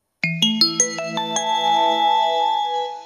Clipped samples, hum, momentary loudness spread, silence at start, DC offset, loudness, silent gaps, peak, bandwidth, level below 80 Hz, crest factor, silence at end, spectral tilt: under 0.1%; none; 7 LU; 0.25 s; under 0.1%; -19 LUFS; none; 0 dBFS; 13.5 kHz; -82 dBFS; 20 dB; 0 s; -2 dB/octave